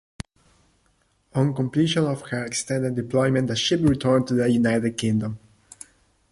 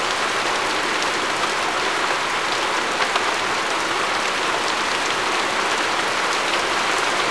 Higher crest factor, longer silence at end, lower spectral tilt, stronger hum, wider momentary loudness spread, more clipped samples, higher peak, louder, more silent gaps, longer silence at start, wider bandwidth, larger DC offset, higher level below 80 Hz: about the same, 16 dB vs 16 dB; first, 0.95 s vs 0 s; first, -5.5 dB/octave vs -1 dB/octave; neither; first, 21 LU vs 1 LU; neither; about the same, -6 dBFS vs -4 dBFS; second, -23 LUFS vs -20 LUFS; neither; first, 1.35 s vs 0 s; about the same, 11.5 kHz vs 11 kHz; second, under 0.1% vs 0.4%; about the same, -50 dBFS vs -54 dBFS